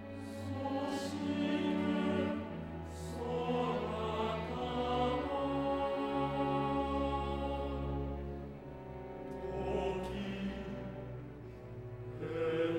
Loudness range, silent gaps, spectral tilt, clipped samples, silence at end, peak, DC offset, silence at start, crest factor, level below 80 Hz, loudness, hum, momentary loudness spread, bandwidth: 6 LU; none; -7 dB/octave; under 0.1%; 0 s; -22 dBFS; under 0.1%; 0 s; 14 dB; -50 dBFS; -37 LUFS; none; 12 LU; 16.5 kHz